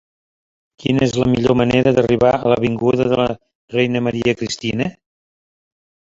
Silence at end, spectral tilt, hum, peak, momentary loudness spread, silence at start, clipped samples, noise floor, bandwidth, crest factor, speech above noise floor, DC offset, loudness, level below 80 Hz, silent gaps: 1.2 s; -6.5 dB/octave; none; -2 dBFS; 9 LU; 0.8 s; under 0.1%; under -90 dBFS; 7.8 kHz; 16 dB; over 74 dB; under 0.1%; -17 LUFS; -44 dBFS; 3.55-3.68 s